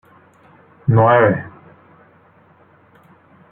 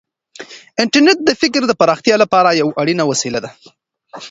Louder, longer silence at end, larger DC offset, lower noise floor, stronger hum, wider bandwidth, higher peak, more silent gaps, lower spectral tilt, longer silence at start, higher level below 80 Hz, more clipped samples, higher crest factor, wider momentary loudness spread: about the same, -15 LUFS vs -14 LUFS; first, 2.05 s vs 0 s; neither; first, -51 dBFS vs -37 dBFS; neither; second, 3.6 kHz vs 8 kHz; about the same, -2 dBFS vs 0 dBFS; neither; first, -11 dB/octave vs -3.5 dB/octave; first, 0.85 s vs 0.4 s; about the same, -54 dBFS vs -58 dBFS; neither; about the same, 18 dB vs 16 dB; second, 14 LU vs 19 LU